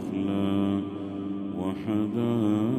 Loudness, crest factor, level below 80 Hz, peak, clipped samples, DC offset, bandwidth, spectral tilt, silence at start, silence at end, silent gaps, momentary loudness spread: -28 LUFS; 12 dB; -64 dBFS; -14 dBFS; under 0.1%; under 0.1%; 12 kHz; -8.5 dB/octave; 0 s; 0 s; none; 8 LU